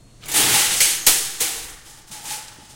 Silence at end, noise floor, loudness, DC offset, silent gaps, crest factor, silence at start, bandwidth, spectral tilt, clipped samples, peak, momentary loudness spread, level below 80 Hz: 0.25 s; -41 dBFS; -16 LUFS; under 0.1%; none; 22 dB; 0.25 s; 17 kHz; 1 dB/octave; under 0.1%; 0 dBFS; 18 LU; -50 dBFS